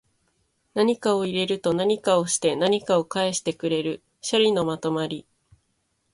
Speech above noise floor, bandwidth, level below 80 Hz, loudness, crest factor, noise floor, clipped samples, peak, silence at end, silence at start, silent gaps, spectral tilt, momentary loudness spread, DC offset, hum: 49 dB; 11.5 kHz; -64 dBFS; -24 LUFS; 18 dB; -72 dBFS; under 0.1%; -8 dBFS; 0.95 s; 0.75 s; none; -4 dB/octave; 8 LU; under 0.1%; none